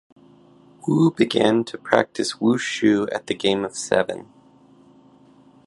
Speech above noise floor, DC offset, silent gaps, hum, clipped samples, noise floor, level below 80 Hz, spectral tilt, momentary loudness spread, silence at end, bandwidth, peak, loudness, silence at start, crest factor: 32 dB; under 0.1%; none; none; under 0.1%; -52 dBFS; -62 dBFS; -5 dB/octave; 7 LU; 1.4 s; 11.5 kHz; 0 dBFS; -21 LUFS; 0.85 s; 22 dB